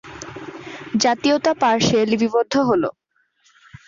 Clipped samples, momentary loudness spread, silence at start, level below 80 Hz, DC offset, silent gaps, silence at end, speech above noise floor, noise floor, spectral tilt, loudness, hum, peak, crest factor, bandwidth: under 0.1%; 17 LU; 0.05 s; -54 dBFS; under 0.1%; none; 0.95 s; 45 dB; -62 dBFS; -4.5 dB/octave; -18 LUFS; none; -6 dBFS; 14 dB; 7.4 kHz